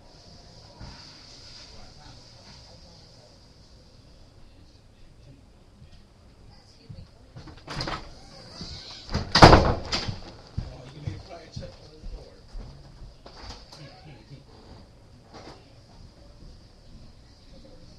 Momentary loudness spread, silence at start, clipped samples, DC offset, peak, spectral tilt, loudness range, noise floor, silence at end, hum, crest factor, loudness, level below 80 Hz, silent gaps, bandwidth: 23 LU; 0.8 s; under 0.1%; under 0.1%; 0 dBFS; -5 dB/octave; 25 LU; -52 dBFS; 2.5 s; none; 30 dB; -22 LUFS; -38 dBFS; none; 12.5 kHz